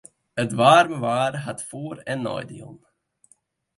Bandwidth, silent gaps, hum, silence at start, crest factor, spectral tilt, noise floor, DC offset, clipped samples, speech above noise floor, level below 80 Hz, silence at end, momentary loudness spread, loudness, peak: 11.5 kHz; none; none; 0.35 s; 20 dB; -5 dB/octave; -62 dBFS; under 0.1%; under 0.1%; 40 dB; -64 dBFS; 1 s; 18 LU; -22 LUFS; -2 dBFS